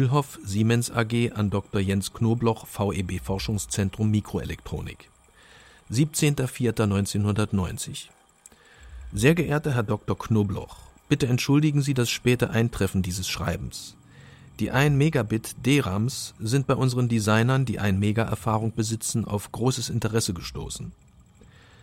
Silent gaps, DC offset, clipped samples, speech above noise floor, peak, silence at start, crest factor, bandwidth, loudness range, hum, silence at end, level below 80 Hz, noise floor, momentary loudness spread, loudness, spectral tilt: none; under 0.1%; under 0.1%; 30 dB; -6 dBFS; 0 s; 18 dB; 16.5 kHz; 4 LU; none; 0.9 s; -46 dBFS; -54 dBFS; 12 LU; -25 LUFS; -5.5 dB/octave